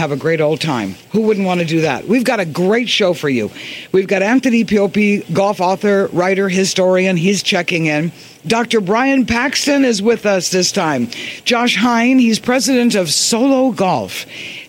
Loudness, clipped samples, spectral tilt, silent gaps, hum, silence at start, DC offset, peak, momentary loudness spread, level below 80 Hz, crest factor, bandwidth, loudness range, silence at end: -14 LUFS; under 0.1%; -4 dB/octave; none; none; 0 s; under 0.1%; -2 dBFS; 6 LU; -52 dBFS; 12 dB; 16.5 kHz; 2 LU; 0.05 s